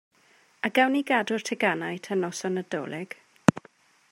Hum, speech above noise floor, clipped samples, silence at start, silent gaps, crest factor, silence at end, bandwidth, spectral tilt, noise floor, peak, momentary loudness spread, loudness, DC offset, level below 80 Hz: none; 34 dB; under 0.1%; 0.65 s; none; 26 dB; 0.55 s; 16 kHz; -5 dB/octave; -61 dBFS; 0 dBFS; 12 LU; -27 LUFS; under 0.1%; -70 dBFS